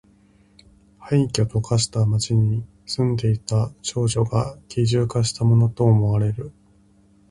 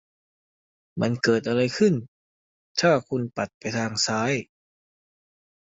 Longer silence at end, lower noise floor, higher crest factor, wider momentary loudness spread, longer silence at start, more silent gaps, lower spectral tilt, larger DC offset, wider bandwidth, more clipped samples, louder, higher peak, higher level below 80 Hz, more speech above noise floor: second, 0.8 s vs 1.2 s; second, -55 dBFS vs under -90 dBFS; about the same, 16 dB vs 20 dB; about the same, 8 LU vs 9 LU; about the same, 1 s vs 0.95 s; second, none vs 2.08-2.75 s, 3.54-3.61 s; first, -6 dB/octave vs -4.5 dB/octave; neither; first, 11.5 kHz vs 8.2 kHz; neither; first, -21 LUFS vs -24 LUFS; about the same, -4 dBFS vs -6 dBFS; first, -46 dBFS vs -62 dBFS; second, 36 dB vs over 66 dB